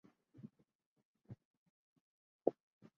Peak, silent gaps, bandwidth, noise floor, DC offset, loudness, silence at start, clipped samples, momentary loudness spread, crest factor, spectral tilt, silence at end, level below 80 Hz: -16 dBFS; 0.75-0.79 s, 0.86-0.96 s, 1.05-1.15 s, 1.45-2.39 s; 6.2 kHz; -60 dBFS; under 0.1%; -42 LUFS; 0.4 s; under 0.1%; 19 LU; 34 dB; -10 dB/octave; 0.45 s; -86 dBFS